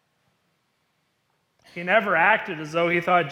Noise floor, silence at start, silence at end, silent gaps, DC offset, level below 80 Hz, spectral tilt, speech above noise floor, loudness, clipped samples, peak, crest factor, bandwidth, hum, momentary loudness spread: -71 dBFS; 1.75 s; 0 s; none; under 0.1%; -72 dBFS; -5.5 dB/octave; 50 dB; -21 LUFS; under 0.1%; -4 dBFS; 20 dB; 15 kHz; none; 12 LU